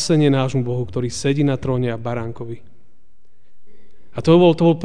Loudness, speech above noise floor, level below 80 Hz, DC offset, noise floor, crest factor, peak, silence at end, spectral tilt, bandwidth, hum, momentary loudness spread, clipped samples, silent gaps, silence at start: -18 LUFS; 44 dB; -46 dBFS; 2%; -61 dBFS; 16 dB; -2 dBFS; 0 s; -6.5 dB/octave; 10 kHz; none; 19 LU; under 0.1%; none; 0 s